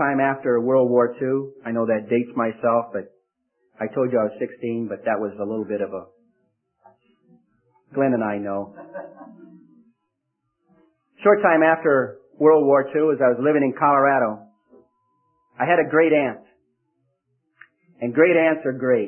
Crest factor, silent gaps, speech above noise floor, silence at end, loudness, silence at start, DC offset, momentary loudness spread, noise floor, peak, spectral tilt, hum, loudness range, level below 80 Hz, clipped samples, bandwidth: 18 dB; none; 57 dB; 0 s; -20 LUFS; 0 s; under 0.1%; 15 LU; -77 dBFS; -4 dBFS; -11.5 dB/octave; none; 10 LU; -72 dBFS; under 0.1%; 3.3 kHz